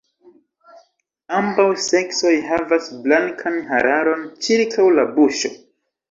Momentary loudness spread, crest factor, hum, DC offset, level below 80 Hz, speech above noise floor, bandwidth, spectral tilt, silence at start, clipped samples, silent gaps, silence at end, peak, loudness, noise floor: 8 LU; 16 dB; none; under 0.1%; -60 dBFS; 42 dB; 7.8 kHz; -3.5 dB/octave; 1.3 s; under 0.1%; none; 0.55 s; -2 dBFS; -18 LUFS; -60 dBFS